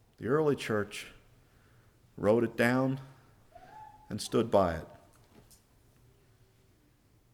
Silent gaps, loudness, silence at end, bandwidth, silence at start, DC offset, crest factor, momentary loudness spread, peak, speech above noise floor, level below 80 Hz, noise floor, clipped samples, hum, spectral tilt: none; -31 LUFS; 2.35 s; 19 kHz; 0.2 s; under 0.1%; 22 dB; 24 LU; -12 dBFS; 36 dB; -60 dBFS; -66 dBFS; under 0.1%; none; -6 dB/octave